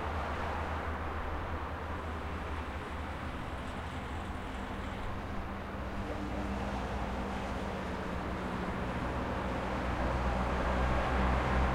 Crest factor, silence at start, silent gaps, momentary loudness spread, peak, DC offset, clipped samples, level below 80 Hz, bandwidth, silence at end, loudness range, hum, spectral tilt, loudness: 18 dB; 0 s; none; 8 LU; -18 dBFS; under 0.1%; under 0.1%; -40 dBFS; 13 kHz; 0 s; 6 LU; none; -6.5 dB/octave; -37 LUFS